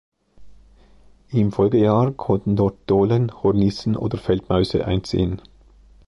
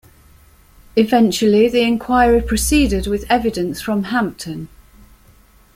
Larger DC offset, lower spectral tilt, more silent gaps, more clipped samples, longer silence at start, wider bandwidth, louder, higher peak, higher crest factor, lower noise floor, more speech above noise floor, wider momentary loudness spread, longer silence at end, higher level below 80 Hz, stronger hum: neither; first, -8.5 dB/octave vs -4.5 dB/octave; neither; neither; second, 0.4 s vs 0.95 s; second, 11 kHz vs 16.5 kHz; second, -20 LUFS vs -16 LUFS; second, -6 dBFS vs -2 dBFS; about the same, 16 dB vs 16 dB; about the same, -52 dBFS vs -49 dBFS; about the same, 32 dB vs 33 dB; second, 6 LU vs 10 LU; second, 0.7 s vs 1.1 s; second, -40 dBFS vs -32 dBFS; neither